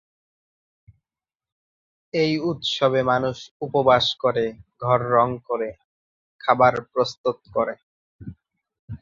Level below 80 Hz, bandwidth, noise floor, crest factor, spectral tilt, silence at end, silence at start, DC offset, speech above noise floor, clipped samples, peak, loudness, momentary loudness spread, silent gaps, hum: -56 dBFS; 7.6 kHz; under -90 dBFS; 20 dB; -5.5 dB/octave; 0.05 s; 2.15 s; under 0.1%; over 69 dB; under 0.1%; -2 dBFS; -22 LUFS; 15 LU; 3.51-3.60 s, 5.84-6.39 s, 7.18-7.24 s, 7.83-8.19 s, 8.79-8.88 s; none